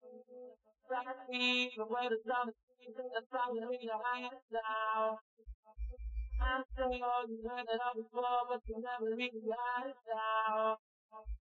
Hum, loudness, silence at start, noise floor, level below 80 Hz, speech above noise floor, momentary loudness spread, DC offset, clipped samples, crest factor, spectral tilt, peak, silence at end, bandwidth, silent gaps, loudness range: none; -38 LUFS; 0.05 s; -58 dBFS; -50 dBFS; 20 dB; 16 LU; under 0.1%; under 0.1%; 18 dB; -2 dB/octave; -22 dBFS; 0.05 s; 7.4 kHz; 2.63-2.68 s, 3.26-3.30 s, 4.42-4.48 s, 5.21-5.37 s, 5.54-5.63 s, 10.79-11.09 s; 2 LU